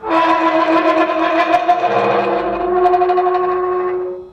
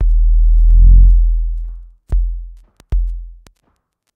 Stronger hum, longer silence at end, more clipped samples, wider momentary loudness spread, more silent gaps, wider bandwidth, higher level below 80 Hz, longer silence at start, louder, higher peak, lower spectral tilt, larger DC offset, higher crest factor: neither; second, 0 s vs 0.85 s; neither; second, 5 LU vs 19 LU; neither; first, 8 kHz vs 0.7 kHz; second, -48 dBFS vs -12 dBFS; about the same, 0 s vs 0 s; about the same, -15 LUFS vs -15 LUFS; about the same, -2 dBFS vs 0 dBFS; second, -6 dB/octave vs -10 dB/octave; neither; about the same, 12 dB vs 12 dB